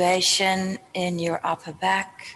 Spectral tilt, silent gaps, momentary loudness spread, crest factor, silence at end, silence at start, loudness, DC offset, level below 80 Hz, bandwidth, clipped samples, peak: -3 dB/octave; none; 10 LU; 16 dB; 0 s; 0 s; -23 LUFS; under 0.1%; -66 dBFS; 13 kHz; under 0.1%; -8 dBFS